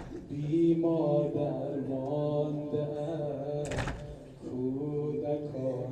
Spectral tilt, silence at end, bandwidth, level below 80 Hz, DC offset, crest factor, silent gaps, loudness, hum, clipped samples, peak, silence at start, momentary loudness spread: -8 dB/octave; 0 s; 9.8 kHz; -54 dBFS; under 0.1%; 16 dB; none; -32 LUFS; none; under 0.1%; -16 dBFS; 0 s; 10 LU